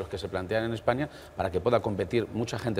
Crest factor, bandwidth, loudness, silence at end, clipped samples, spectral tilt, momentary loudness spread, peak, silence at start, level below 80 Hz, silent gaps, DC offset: 20 dB; 16 kHz; -30 LUFS; 0 s; under 0.1%; -6.5 dB/octave; 7 LU; -8 dBFS; 0 s; -52 dBFS; none; under 0.1%